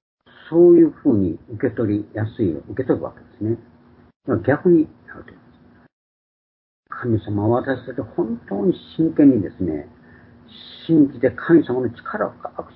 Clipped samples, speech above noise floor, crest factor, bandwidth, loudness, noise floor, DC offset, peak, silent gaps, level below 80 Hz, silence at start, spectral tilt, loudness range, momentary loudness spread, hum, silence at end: under 0.1%; 32 dB; 18 dB; 4.5 kHz; -19 LUFS; -51 dBFS; under 0.1%; -2 dBFS; 4.16-4.20 s, 5.93-6.83 s; -50 dBFS; 0.45 s; -13 dB/octave; 6 LU; 14 LU; none; 0.1 s